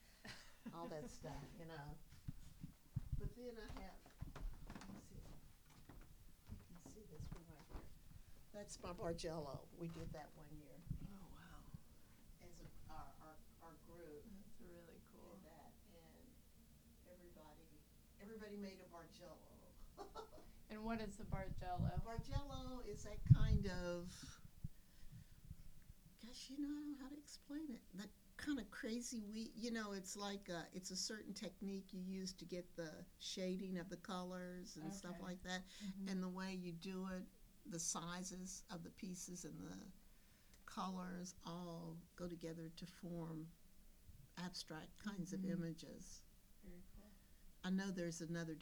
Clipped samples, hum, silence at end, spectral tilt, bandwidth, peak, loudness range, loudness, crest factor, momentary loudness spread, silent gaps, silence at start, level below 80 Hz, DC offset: under 0.1%; none; 0 s; -5 dB/octave; over 20 kHz; -18 dBFS; 18 LU; -49 LUFS; 32 dB; 19 LU; none; 0 s; -58 dBFS; under 0.1%